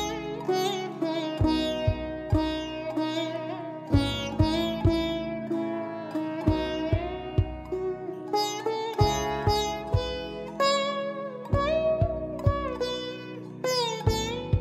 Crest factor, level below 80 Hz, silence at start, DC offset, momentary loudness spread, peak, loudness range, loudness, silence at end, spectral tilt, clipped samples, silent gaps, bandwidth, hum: 20 dB; -40 dBFS; 0 s; under 0.1%; 8 LU; -8 dBFS; 2 LU; -28 LUFS; 0 s; -5.5 dB/octave; under 0.1%; none; 14.5 kHz; none